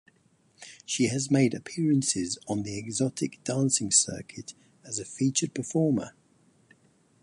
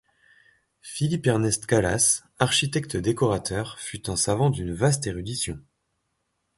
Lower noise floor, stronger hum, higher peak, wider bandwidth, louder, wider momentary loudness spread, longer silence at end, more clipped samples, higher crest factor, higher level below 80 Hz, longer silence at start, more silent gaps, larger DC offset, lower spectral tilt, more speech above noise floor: second, -65 dBFS vs -76 dBFS; neither; second, -8 dBFS vs -4 dBFS; about the same, 11.5 kHz vs 12 kHz; second, -27 LUFS vs -24 LUFS; first, 18 LU vs 10 LU; first, 1.15 s vs 1 s; neither; about the same, 22 dB vs 22 dB; second, -64 dBFS vs -48 dBFS; second, 0.6 s vs 0.85 s; neither; neither; about the same, -4 dB/octave vs -4 dB/octave; second, 37 dB vs 51 dB